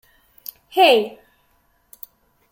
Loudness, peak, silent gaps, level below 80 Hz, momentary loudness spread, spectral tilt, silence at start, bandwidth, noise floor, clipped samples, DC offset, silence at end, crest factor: -17 LUFS; -2 dBFS; none; -66 dBFS; 26 LU; -2.5 dB/octave; 0.75 s; 17 kHz; -62 dBFS; under 0.1%; under 0.1%; 1.4 s; 20 dB